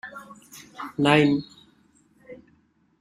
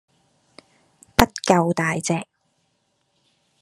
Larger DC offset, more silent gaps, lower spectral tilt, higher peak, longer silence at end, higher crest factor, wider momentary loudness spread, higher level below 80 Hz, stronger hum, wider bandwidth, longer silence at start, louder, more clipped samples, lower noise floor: neither; neither; first, -6 dB/octave vs -4.5 dB/octave; second, -4 dBFS vs 0 dBFS; second, 0.65 s vs 1.4 s; about the same, 24 dB vs 24 dB; first, 26 LU vs 9 LU; second, -62 dBFS vs -42 dBFS; neither; first, 14.5 kHz vs 13 kHz; second, 0.05 s vs 1.2 s; about the same, -22 LUFS vs -21 LUFS; neither; second, -63 dBFS vs -69 dBFS